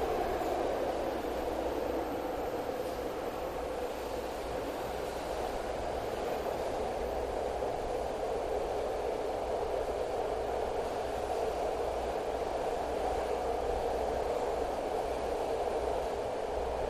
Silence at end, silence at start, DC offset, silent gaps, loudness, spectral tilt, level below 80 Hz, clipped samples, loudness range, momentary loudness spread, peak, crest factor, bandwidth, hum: 0 s; 0 s; under 0.1%; none; -35 LUFS; -5 dB/octave; -48 dBFS; under 0.1%; 3 LU; 4 LU; -20 dBFS; 14 dB; 15.5 kHz; none